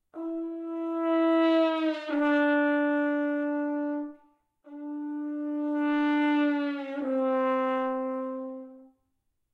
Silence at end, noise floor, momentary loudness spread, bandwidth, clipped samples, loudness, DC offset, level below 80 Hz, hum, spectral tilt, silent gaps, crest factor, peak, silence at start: 0.7 s; -77 dBFS; 12 LU; 5.4 kHz; under 0.1%; -28 LUFS; under 0.1%; -82 dBFS; none; -5 dB/octave; none; 14 dB; -14 dBFS; 0.15 s